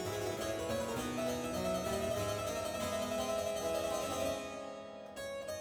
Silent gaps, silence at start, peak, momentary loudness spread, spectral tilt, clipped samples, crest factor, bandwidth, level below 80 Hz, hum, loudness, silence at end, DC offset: none; 0 s; -24 dBFS; 8 LU; -4 dB/octave; under 0.1%; 14 dB; over 20 kHz; -58 dBFS; none; -38 LUFS; 0 s; under 0.1%